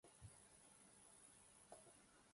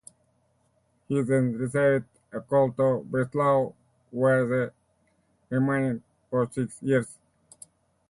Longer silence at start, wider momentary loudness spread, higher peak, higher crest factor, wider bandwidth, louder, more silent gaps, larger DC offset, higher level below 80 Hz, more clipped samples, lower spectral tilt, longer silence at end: second, 0.05 s vs 1.1 s; second, 2 LU vs 11 LU; second, -46 dBFS vs -12 dBFS; first, 22 dB vs 16 dB; about the same, 11.5 kHz vs 11.5 kHz; second, -66 LUFS vs -26 LUFS; neither; neither; second, -82 dBFS vs -64 dBFS; neither; second, -3 dB/octave vs -8 dB/octave; second, 0 s vs 0.95 s